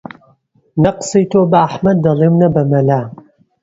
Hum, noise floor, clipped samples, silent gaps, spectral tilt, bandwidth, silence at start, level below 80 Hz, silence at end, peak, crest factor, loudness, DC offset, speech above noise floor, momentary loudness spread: none; -54 dBFS; under 0.1%; none; -7.5 dB/octave; 8 kHz; 0.75 s; -46 dBFS; 0.5 s; 0 dBFS; 14 dB; -13 LUFS; under 0.1%; 42 dB; 6 LU